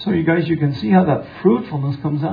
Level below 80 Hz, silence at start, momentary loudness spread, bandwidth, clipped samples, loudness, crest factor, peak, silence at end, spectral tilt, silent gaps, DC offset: -50 dBFS; 0 s; 7 LU; 5 kHz; under 0.1%; -18 LUFS; 16 dB; -2 dBFS; 0 s; -10 dB/octave; none; under 0.1%